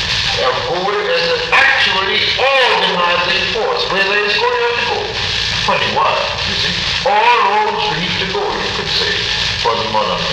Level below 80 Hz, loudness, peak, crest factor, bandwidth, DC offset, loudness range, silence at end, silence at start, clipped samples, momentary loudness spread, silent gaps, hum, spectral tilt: -38 dBFS; -13 LUFS; -2 dBFS; 12 dB; 13 kHz; under 0.1%; 2 LU; 0 s; 0 s; under 0.1%; 6 LU; none; none; -2.5 dB/octave